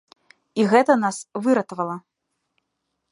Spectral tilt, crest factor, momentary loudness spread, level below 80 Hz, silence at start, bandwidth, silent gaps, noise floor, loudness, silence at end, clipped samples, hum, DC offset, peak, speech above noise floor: -5.5 dB/octave; 20 dB; 13 LU; -76 dBFS; 0.55 s; 11.5 kHz; none; -77 dBFS; -21 LUFS; 1.1 s; under 0.1%; none; under 0.1%; -2 dBFS; 57 dB